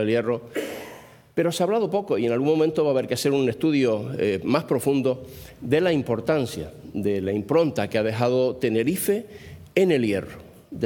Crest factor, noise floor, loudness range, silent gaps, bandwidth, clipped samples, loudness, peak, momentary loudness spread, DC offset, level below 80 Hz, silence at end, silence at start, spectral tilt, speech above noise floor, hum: 18 dB; -45 dBFS; 2 LU; none; 19.5 kHz; under 0.1%; -23 LUFS; -6 dBFS; 12 LU; under 0.1%; -58 dBFS; 0 s; 0 s; -6 dB/octave; 22 dB; none